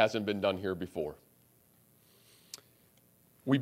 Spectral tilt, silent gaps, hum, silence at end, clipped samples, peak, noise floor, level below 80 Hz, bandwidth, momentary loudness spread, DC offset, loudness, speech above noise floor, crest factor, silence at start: -6 dB/octave; none; none; 0 s; under 0.1%; -10 dBFS; -66 dBFS; -70 dBFS; 16 kHz; 18 LU; under 0.1%; -34 LUFS; 33 dB; 26 dB; 0 s